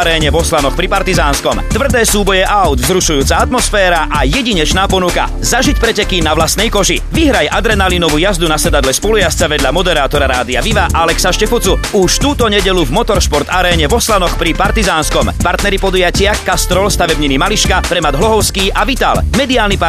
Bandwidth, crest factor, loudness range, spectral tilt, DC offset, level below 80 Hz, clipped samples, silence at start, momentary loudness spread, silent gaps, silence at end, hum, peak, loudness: 14 kHz; 10 dB; 1 LU; -3.5 dB/octave; under 0.1%; -18 dBFS; under 0.1%; 0 s; 2 LU; none; 0 s; none; 0 dBFS; -11 LUFS